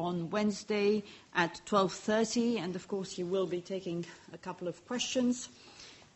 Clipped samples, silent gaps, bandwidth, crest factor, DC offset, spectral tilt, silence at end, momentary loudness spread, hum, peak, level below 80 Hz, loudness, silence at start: under 0.1%; none; 8.4 kHz; 20 dB; under 0.1%; -4.5 dB/octave; 0.2 s; 15 LU; none; -12 dBFS; -70 dBFS; -33 LUFS; 0 s